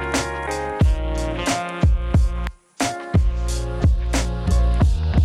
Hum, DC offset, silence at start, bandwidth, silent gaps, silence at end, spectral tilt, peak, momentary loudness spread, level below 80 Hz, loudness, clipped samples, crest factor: none; under 0.1%; 0 s; 12.5 kHz; none; 0 s; -5.5 dB/octave; -10 dBFS; 7 LU; -22 dBFS; -22 LUFS; under 0.1%; 10 dB